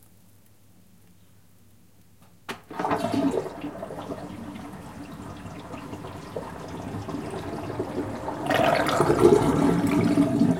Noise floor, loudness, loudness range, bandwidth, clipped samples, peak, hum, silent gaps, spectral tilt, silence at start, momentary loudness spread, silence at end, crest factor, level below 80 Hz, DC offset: -57 dBFS; -25 LUFS; 14 LU; 16.5 kHz; under 0.1%; -4 dBFS; none; none; -6.5 dB/octave; 2.5 s; 19 LU; 0 s; 24 dB; -50 dBFS; 0.1%